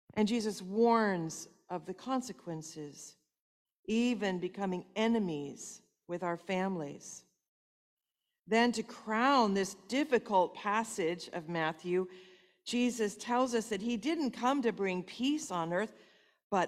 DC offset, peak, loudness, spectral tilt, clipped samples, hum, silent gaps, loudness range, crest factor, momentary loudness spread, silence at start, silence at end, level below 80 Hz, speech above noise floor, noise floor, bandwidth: under 0.1%; -14 dBFS; -34 LUFS; -4.5 dB/octave; under 0.1%; none; 3.40-3.65 s, 3.72-3.83 s, 7.48-7.97 s, 16.43-16.50 s; 6 LU; 20 dB; 14 LU; 0.15 s; 0 s; -74 dBFS; 56 dB; -89 dBFS; 14 kHz